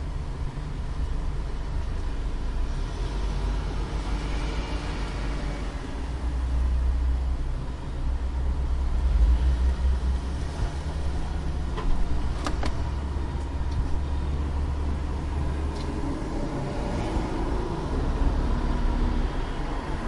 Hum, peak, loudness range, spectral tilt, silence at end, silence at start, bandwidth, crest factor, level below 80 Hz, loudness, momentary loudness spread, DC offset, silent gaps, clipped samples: none; -12 dBFS; 4 LU; -7 dB/octave; 0 s; 0 s; 11 kHz; 14 dB; -28 dBFS; -30 LUFS; 7 LU; under 0.1%; none; under 0.1%